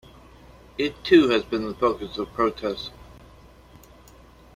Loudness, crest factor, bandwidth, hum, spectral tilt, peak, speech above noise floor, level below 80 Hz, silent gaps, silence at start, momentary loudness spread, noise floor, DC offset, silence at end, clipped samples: -23 LUFS; 22 dB; 14 kHz; none; -5.5 dB/octave; -4 dBFS; 27 dB; -50 dBFS; none; 0.8 s; 16 LU; -50 dBFS; under 0.1%; 1.45 s; under 0.1%